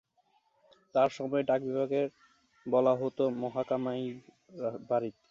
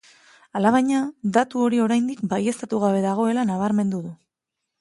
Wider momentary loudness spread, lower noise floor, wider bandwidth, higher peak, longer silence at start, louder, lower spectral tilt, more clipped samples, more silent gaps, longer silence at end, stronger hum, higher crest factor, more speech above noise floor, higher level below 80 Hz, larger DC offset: first, 10 LU vs 6 LU; second, -72 dBFS vs -83 dBFS; second, 7.4 kHz vs 11.5 kHz; second, -14 dBFS vs -4 dBFS; first, 0.95 s vs 0.55 s; second, -31 LUFS vs -22 LUFS; about the same, -7.5 dB/octave vs -6.5 dB/octave; neither; neither; second, 0.2 s vs 0.65 s; neither; about the same, 18 dB vs 18 dB; second, 41 dB vs 61 dB; second, -76 dBFS vs -66 dBFS; neither